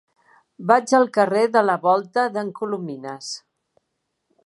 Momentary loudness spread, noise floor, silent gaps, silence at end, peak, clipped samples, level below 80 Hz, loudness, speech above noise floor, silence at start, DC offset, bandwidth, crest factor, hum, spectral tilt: 15 LU; -76 dBFS; none; 1.1 s; -2 dBFS; under 0.1%; -78 dBFS; -20 LUFS; 56 dB; 0.6 s; under 0.1%; 11.5 kHz; 20 dB; none; -4.5 dB/octave